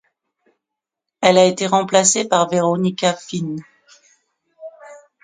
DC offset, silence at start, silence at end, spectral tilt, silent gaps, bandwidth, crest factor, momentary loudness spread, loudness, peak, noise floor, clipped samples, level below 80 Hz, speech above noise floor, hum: under 0.1%; 1.2 s; 0.25 s; -3.5 dB/octave; none; 9.6 kHz; 20 dB; 15 LU; -16 LUFS; 0 dBFS; -83 dBFS; under 0.1%; -64 dBFS; 67 dB; none